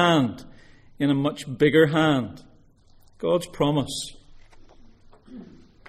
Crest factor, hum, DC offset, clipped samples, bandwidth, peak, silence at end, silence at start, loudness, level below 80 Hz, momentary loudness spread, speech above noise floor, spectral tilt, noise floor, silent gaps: 20 dB; none; under 0.1%; under 0.1%; 14.5 kHz; -4 dBFS; 0.45 s; 0 s; -23 LUFS; -52 dBFS; 22 LU; 32 dB; -6 dB/octave; -54 dBFS; none